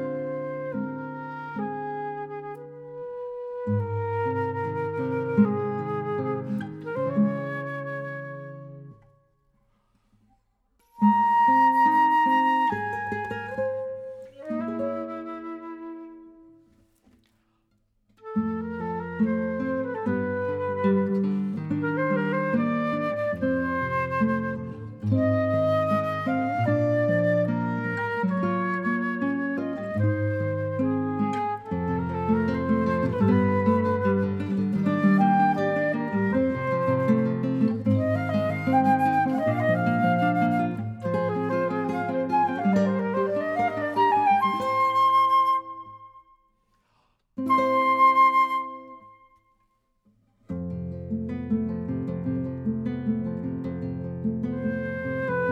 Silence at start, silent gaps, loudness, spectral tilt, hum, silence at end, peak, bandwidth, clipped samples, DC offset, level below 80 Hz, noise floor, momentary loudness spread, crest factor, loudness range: 0 s; none; -25 LUFS; -8.5 dB/octave; none; 0 s; -8 dBFS; 12.5 kHz; under 0.1%; under 0.1%; -62 dBFS; -70 dBFS; 14 LU; 16 dB; 10 LU